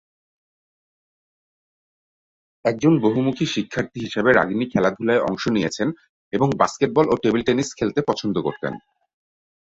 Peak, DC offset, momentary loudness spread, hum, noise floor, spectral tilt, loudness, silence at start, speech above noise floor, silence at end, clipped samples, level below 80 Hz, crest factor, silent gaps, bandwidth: -2 dBFS; under 0.1%; 9 LU; none; under -90 dBFS; -6 dB/octave; -21 LUFS; 2.65 s; over 70 dB; 0.85 s; under 0.1%; -56 dBFS; 20 dB; 6.09-6.31 s; 8 kHz